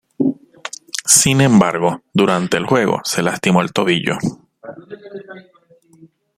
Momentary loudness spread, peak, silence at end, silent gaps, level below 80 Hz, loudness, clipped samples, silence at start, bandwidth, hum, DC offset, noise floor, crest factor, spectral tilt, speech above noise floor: 23 LU; 0 dBFS; 0.95 s; none; -54 dBFS; -15 LUFS; under 0.1%; 0.2 s; 16.5 kHz; none; under 0.1%; -51 dBFS; 18 dB; -4 dB/octave; 36 dB